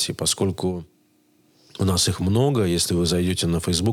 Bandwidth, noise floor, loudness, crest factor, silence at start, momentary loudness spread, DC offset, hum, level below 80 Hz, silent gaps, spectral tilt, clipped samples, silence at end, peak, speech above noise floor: 17.5 kHz; -61 dBFS; -22 LUFS; 16 dB; 0 s; 8 LU; under 0.1%; none; -50 dBFS; none; -4.5 dB/octave; under 0.1%; 0 s; -6 dBFS; 40 dB